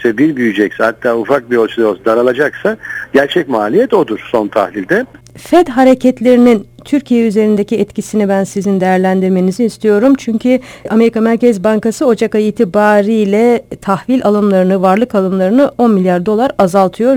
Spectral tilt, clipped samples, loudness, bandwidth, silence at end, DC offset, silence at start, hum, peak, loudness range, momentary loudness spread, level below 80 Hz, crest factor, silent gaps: -6.5 dB/octave; 0.3%; -12 LUFS; 18 kHz; 0 s; under 0.1%; 0 s; none; 0 dBFS; 2 LU; 6 LU; -48 dBFS; 10 dB; none